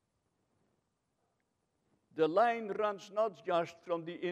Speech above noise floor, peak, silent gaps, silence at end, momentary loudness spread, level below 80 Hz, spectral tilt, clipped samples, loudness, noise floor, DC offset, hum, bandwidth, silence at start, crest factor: 48 dB; -18 dBFS; none; 0 s; 10 LU; -88 dBFS; -5.5 dB/octave; under 0.1%; -34 LUFS; -81 dBFS; under 0.1%; none; 8.6 kHz; 2.15 s; 20 dB